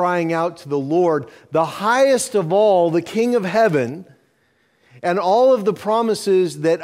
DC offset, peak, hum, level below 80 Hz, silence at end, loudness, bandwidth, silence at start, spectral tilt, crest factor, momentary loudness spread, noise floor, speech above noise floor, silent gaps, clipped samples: under 0.1%; -4 dBFS; none; -66 dBFS; 0 s; -18 LUFS; 15.5 kHz; 0 s; -5.5 dB/octave; 14 dB; 8 LU; -62 dBFS; 44 dB; none; under 0.1%